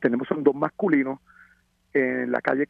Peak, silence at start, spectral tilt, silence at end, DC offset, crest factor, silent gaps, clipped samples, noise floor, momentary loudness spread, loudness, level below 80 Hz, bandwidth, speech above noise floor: -4 dBFS; 0 s; -9 dB/octave; 0.05 s; under 0.1%; 20 dB; none; under 0.1%; -62 dBFS; 6 LU; -24 LUFS; -68 dBFS; 5.2 kHz; 38 dB